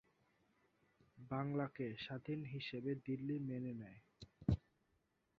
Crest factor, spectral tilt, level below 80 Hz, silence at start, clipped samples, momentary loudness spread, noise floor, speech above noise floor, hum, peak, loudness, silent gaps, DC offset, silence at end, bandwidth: 24 dB; -6.5 dB/octave; -60 dBFS; 1.15 s; under 0.1%; 14 LU; -82 dBFS; 38 dB; none; -22 dBFS; -45 LUFS; none; under 0.1%; 0.8 s; 7.2 kHz